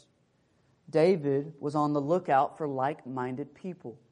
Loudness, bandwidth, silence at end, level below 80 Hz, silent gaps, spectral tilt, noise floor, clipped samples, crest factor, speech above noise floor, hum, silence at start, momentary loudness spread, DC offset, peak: -29 LUFS; 10 kHz; 0.15 s; -76 dBFS; none; -8 dB/octave; -69 dBFS; under 0.1%; 18 dB; 40 dB; none; 0.9 s; 15 LU; under 0.1%; -12 dBFS